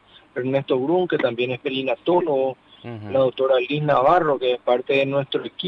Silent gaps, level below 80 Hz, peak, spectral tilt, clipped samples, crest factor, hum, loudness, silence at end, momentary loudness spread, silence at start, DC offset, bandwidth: none; -60 dBFS; -4 dBFS; -8 dB/octave; under 0.1%; 16 dB; none; -21 LUFS; 0 s; 9 LU; 0.35 s; under 0.1%; 5.8 kHz